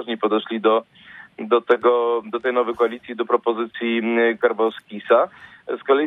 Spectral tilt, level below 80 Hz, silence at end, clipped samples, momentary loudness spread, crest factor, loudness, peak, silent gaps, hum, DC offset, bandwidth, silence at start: -7 dB/octave; -70 dBFS; 0 s; under 0.1%; 11 LU; 18 dB; -21 LUFS; -2 dBFS; none; none; under 0.1%; 4 kHz; 0 s